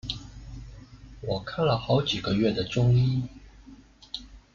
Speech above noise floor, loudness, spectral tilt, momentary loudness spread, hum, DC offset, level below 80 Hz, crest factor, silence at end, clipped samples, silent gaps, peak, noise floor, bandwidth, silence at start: 26 dB; -26 LUFS; -7 dB/octave; 21 LU; none; under 0.1%; -48 dBFS; 16 dB; 0.15 s; under 0.1%; none; -12 dBFS; -51 dBFS; 7.2 kHz; 0.05 s